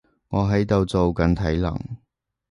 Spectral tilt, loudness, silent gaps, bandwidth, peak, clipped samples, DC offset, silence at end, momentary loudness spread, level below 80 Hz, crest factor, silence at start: -8 dB/octave; -22 LUFS; none; 11 kHz; -4 dBFS; under 0.1%; under 0.1%; 0.55 s; 13 LU; -34 dBFS; 18 dB; 0.3 s